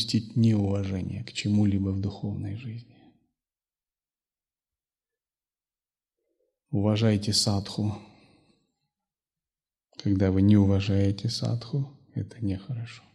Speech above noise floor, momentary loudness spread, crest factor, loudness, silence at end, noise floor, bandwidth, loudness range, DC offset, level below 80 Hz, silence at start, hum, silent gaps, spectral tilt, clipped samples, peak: over 64 dB; 14 LU; 18 dB; -27 LUFS; 0.15 s; under -90 dBFS; 12.5 kHz; 11 LU; under 0.1%; -62 dBFS; 0 s; none; none; -6 dB/octave; under 0.1%; -10 dBFS